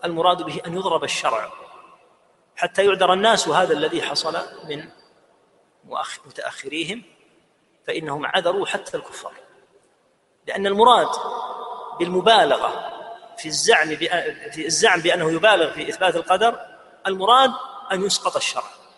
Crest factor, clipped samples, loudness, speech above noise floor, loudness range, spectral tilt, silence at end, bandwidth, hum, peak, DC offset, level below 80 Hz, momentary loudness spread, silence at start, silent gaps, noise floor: 22 dB; under 0.1%; -20 LUFS; 42 dB; 9 LU; -2.5 dB/octave; 0.2 s; 11.5 kHz; none; 0 dBFS; under 0.1%; -66 dBFS; 17 LU; 0 s; none; -63 dBFS